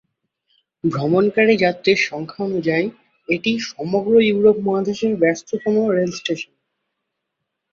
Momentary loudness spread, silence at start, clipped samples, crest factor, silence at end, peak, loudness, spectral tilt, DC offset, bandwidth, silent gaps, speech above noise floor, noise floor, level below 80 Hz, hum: 10 LU; 0.85 s; under 0.1%; 16 dB; 1.3 s; -2 dBFS; -19 LUFS; -5.5 dB/octave; under 0.1%; 7.4 kHz; none; 60 dB; -78 dBFS; -60 dBFS; none